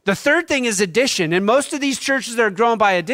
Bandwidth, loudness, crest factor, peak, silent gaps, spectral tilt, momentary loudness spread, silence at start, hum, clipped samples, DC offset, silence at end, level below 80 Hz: 16 kHz; -17 LUFS; 14 dB; -4 dBFS; none; -3.5 dB/octave; 4 LU; 0.05 s; none; under 0.1%; under 0.1%; 0 s; -56 dBFS